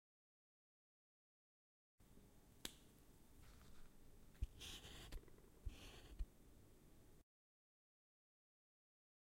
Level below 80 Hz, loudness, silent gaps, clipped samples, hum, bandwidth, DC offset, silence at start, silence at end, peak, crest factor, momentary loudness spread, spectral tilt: -62 dBFS; -58 LUFS; none; under 0.1%; none; 16 kHz; under 0.1%; 2 s; 2 s; -28 dBFS; 30 dB; 14 LU; -3.5 dB/octave